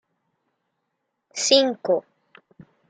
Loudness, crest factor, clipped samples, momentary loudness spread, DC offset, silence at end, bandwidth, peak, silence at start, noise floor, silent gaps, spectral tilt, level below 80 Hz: -20 LUFS; 22 dB; under 0.1%; 9 LU; under 0.1%; 0.9 s; 9.6 kHz; -4 dBFS; 1.35 s; -78 dBFS; none; -1.5 dB/octave; -78 dBFS